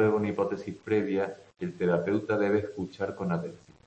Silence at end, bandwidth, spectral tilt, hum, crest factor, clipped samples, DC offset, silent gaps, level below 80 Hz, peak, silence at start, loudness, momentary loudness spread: 0.3 s; 8.4 kHz; -8 dB/octave; none; 16 dB; under 0.1%; under 0.1%; none; -66 dBFS; -12 dBFS; 0 s; -30 LUFS; 10 LU